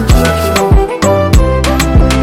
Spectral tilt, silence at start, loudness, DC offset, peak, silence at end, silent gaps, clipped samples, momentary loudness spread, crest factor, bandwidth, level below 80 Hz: -5.5 dB/octave; 0 s; -10 LUFS; under 0.1%; 0 dBFS; 0 s; none; under 0.1%; 2 LU; 8 dB; 16.5 kHz; -12 dBFS